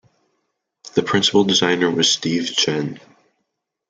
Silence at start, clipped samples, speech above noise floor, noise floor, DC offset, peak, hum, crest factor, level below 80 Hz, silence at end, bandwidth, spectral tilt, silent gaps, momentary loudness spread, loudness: 0.95 s; under 0.1%; 58 dB; -76 dBFS; under 0.1%; -2 dBFS; none; 18 dB; -64 dBFS; 0.9 s; 9.6 kHz; -3 dB/octave; none; 8 LU; -17 LUFS